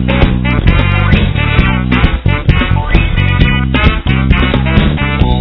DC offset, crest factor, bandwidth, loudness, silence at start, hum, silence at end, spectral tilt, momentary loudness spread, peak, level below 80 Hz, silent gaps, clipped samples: 1%; 10 dB; 5.4 kHz; -11 LUFS; 0 s; none; 0 s; -9 dB/octave; 2 LU; 0 dBFS; -14 dBFS; none; 2%